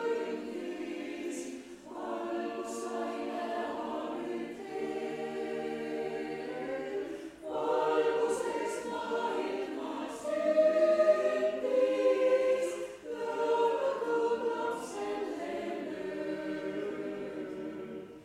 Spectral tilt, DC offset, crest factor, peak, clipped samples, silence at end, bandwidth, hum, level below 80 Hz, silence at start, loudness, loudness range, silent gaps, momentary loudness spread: -4.5 dB/octave; under 0.1%; 18 dB; -14 dBFS; under 0.1%; 0 s; 14.5 kHz; none; -72 dBFS; 0 s; -33 LUFS; 9 LU; none; 12 LU